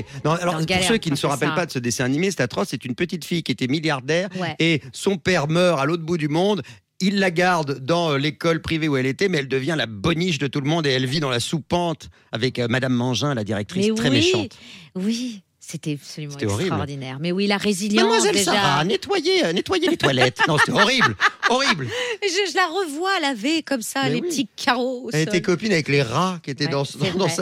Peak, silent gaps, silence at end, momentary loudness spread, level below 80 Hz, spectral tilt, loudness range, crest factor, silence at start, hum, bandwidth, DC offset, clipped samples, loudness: 0 dBFS; none; 0 s; 8 LU; -56 dBFS; -4.5 dB/octave; 5 LU; 20 dB; 0 s; none; 16 kHz; under 0.1%; under 0.1%; -21 LUFS